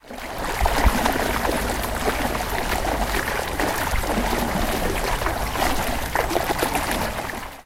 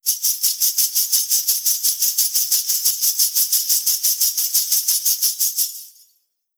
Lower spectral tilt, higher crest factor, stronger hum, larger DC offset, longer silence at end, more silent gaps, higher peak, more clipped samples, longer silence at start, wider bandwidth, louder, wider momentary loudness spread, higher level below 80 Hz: first, -4 dB/octave vs 8.5 dB/octave; about the same, 18 dB vs 18 dB; neither; neither; second, 0.05 s vs 0.7 s; neither; about the same, -4 dBFS vs -2 dBFS; neither; about the same, 0.05 s vs 0.05 s; second, 17 kHz vs over 20 kHz; second, -23 LUFS vs -16 LUFS; about the same, 4 LU vs 2 LU; first, -30 dBFS vs under -90 dBFS